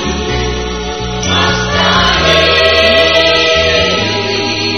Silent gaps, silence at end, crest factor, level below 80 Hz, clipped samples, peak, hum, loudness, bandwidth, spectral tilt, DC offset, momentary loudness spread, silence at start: none; 0 s; 12 dB; -26 dBFS; 0.2%; 0 dBFS; none; -10 LUFS; 13.5 kHz; -3.5 dB/octave; 1%; 10 LU; 0 s